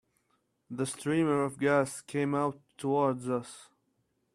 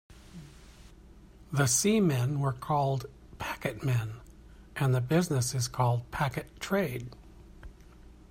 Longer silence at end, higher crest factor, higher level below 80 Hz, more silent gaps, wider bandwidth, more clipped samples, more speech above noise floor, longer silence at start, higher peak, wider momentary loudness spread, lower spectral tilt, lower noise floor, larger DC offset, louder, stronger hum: first, 0.7 s vs 0.2 s; about the same, 20 dB vs 18 dB; second, -72 dBFS vs -54 dBFS; neither; second, 13.5 kHz vs 16 kHz; neither; first, 46 dB vs 24 dB; first, 0.7 s vs 0.1 s; about the same, -12 dBFS vs -12 dBFS; second, 10 LU vs 21 LU; about the same, -6 dB/octave vs -5 dB/octave; first, -76 dBFS vs -53 dBFS; neither; about the same, -31 LUFS vs -30 LUFS; neither